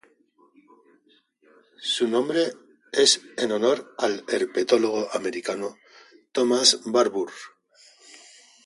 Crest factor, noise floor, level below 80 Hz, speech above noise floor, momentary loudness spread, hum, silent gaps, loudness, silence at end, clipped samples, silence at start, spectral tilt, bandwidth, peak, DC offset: 22 dB; -62 dBFS; -76 dBFS; 39 dB; 13 LU; none; none; -23 LUFS; 0.5 s; under 0.1%; 1.8 s; -2 dB/octave; 11.5 kHz; -2 dBFS; under 0.1%